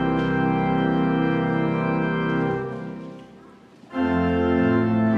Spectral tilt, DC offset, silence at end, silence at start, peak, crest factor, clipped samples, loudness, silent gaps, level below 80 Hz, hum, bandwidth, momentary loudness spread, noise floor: -9 dB/octave; under 0.1%; 0 s; 0 s; -10 dBFS; 12 dB; under 0.1%; -22 LUFS; none; -48 dBFS; none; 6.4 kHz; 13 LU; -48 dBFS